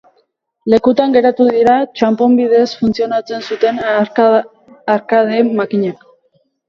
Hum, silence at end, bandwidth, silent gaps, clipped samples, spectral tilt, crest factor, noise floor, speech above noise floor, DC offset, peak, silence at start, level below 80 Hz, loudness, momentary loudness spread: none; 0.75 s; 7.2 kHz; none; under 0.1%; -6.5 dB/octave; 14 dB; -61 dBFS; 48 dB; under 0.1%; 0 dBFS; 0.65 s; -54 dBFS; -13 LUFS; 8 LU